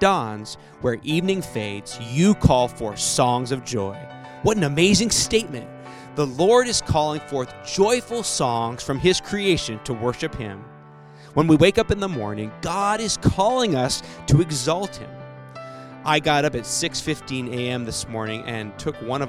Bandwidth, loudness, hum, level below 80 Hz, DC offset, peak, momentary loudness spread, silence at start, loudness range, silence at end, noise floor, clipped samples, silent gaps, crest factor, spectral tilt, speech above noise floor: 15.5 kHz; -22 LUFS; none; -42 dBFS; under 0.1%; -2 dBFS; 16 LU; 0 s; 4 LU; 0 s; -44 dBFS; under 0.1%; none; 20 dB; -4.5 dB/octave; 23 dB